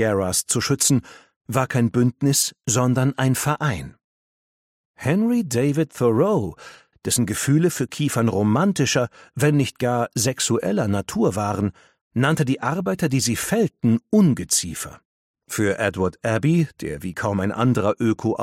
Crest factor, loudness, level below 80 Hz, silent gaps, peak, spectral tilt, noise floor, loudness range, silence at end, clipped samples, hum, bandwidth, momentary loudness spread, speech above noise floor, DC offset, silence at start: 16 dB; -21 LUFS; -52 dBFS; 1.36-1.41 s, 4.04-4.94 s, 12.01-12.11 s, 15.05-15.34 s; -4 dBFS; -5 dB/octave; under -90 dBFS; 2 LU; 0 s; under 0.1%; none; 16.5 kHz; 7 LU; over 69 dB; under 0.1%; 0 s